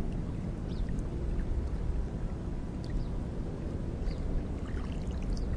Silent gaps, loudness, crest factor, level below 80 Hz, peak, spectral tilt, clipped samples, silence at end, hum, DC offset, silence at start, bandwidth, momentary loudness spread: none; -37 LUFS; 12 dB; -36 dBFS; -20 dBFS; -8 dB/octave; under 0.1%; 0 s; none; under 0.1%; 0 s; 10 kHz; 2 LU